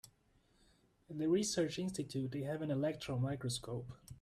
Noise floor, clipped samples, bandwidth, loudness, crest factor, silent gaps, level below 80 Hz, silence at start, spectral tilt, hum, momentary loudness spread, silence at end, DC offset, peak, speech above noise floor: -73 dBFS; under 0.1%; 14 kHz; -39 LUFS; 16 dB; none; -68 dBFS; 0.05 s; -5.5 dB/octave; none; 12 LU; 0 s; under 0.1%; -24 dBFS; 34 dB